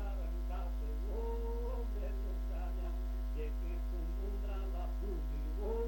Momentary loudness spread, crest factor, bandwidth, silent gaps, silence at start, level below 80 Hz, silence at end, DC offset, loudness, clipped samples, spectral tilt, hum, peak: 1 LU; 10 dB; 17 kHz; none; 0 s; -38 dBFS; 0 s; under 0.1%; -41 LUFS; under 0.1%; -8 dB/octave; none; -28 dBFS